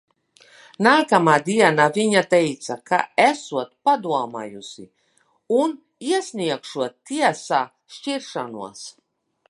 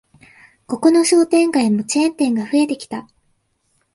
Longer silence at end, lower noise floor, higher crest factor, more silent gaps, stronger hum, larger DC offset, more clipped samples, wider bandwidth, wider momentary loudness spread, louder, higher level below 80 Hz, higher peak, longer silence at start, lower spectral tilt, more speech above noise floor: second, 0.6 s vs 0.9 s; about the same, -64 dBFS vs -65 dBFS; about the same, 20 dB vs 16 dB; neither; neither; neither; neither; about the same, 11.5 kHz vs 11.5 kHz; first, 17 LU vs 14 LU; second, -20 LUFS vs -16 LUFS; second, -72 dBFS vs -64 dBFS; about the same, 0 dBFS vs -2 dBFS; about the same, 0.8 s vs 0.7 s; about the same, -4.5 dB/octave vs -4 dB/octave; second, 43 dB vs 50 dB